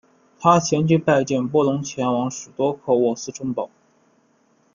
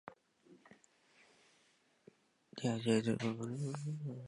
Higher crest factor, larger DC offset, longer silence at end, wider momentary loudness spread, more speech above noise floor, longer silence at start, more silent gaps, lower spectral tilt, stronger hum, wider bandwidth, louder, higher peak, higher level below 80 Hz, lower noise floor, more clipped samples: about the same, 20 dB vs 22 dB; neither; first, 1.1 s vs 0 s; second, 10 LU vs 13 LU; first, 41 dB vs 36 dB; first, 0.4 s vs 0.05 s; neither; about the same, -6 dB/octave vs -6 dB/octave; neither; second, 7.4 kHz vs 11.5 kHz; first, -21 LUFS vs -38 LUFS; first, -2 dBFS vs -20 dBFS; first, -62 dBFS vs -80 dBFS; second, -61 dBFS vs -73 dBFS; neither